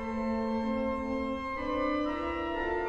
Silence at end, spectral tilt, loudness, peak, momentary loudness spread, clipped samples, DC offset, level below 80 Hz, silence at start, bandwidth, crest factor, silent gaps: 0 s; -6.5 dB/octave; -32 LUFS; -20 dBFS; 3 LU; under 0.1%; under 0.1%; -48 dBFS; 0 s; 8 kHz; 12 dB; none